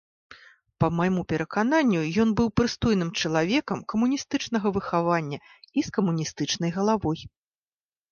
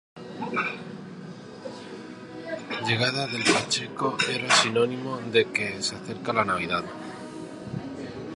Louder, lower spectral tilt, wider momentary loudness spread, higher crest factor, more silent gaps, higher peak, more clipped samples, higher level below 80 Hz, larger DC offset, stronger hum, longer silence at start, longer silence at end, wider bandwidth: about the same, -25 LUFS vs -26 LUFS; first, -5.5 dB/octave vs -3 dB/octave; second, 6 LU vs 18 LU; second, 16 dB vs 24 dB; neither; second, -8 dBFS vs -4 dBFS; neither; first, -50 dBFS vs -62 dBFS; neither; neither; first, 0.3 s vs 0.15 s; first, 0.85 s vs 0 s; second, 7.2 kHz vs 11.5 kHz